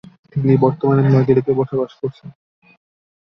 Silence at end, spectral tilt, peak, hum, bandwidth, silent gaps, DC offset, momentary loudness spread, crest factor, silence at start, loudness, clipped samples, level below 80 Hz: 0.95 s; -11 dB/octave; -2 dBFS; none; 5.8 kHz; none; under 0.1%; 13 LU; 16 dB; 0.35 s; -17 LUFS; under 0.1%; -54 dBFS